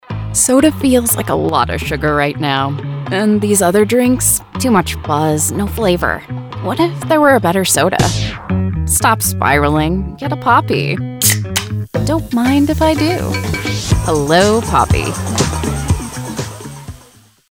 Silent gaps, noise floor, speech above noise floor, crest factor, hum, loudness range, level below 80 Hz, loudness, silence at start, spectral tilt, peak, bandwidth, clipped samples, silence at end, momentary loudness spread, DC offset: none; -45 dBFS; 32 dB; 14 dB; none; 2 LU; -30 dBFS; -14 LUFS; 0.1 s; -4.5 dB/octave; 0 dBFS; over 20 kHz; under 0.1%; 0.55 s; 9 LU; under 0.1%